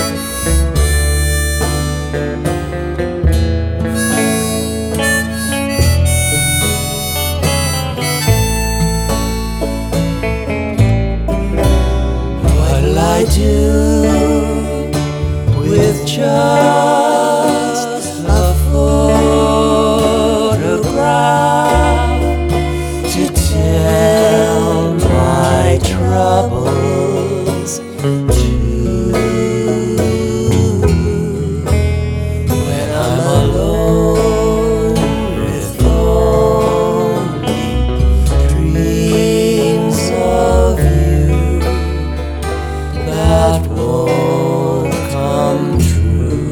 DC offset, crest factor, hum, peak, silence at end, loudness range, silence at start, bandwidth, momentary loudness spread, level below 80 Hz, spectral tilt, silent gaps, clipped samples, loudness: under 0.1%; 12 dB; none; 0 dBFS; 0 s; 3 LU; 0 s; 18 kHz; 7 LU; -18 dBFS; -5.5 dB/octave; none; under 0.1%; -14 LUFS